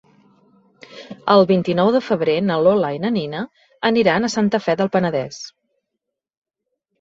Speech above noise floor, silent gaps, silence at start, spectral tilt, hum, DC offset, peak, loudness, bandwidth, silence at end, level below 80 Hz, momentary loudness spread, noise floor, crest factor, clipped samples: 63 dB; none; 0.9 s; -6 dB/octave; none; under 0.1%; -2 dBFS; -18 LUFS; 7.8 kHz; 1.5 s; -60 dBFS; 15 LU; -80 dBFS; 18 dB; under 0.1%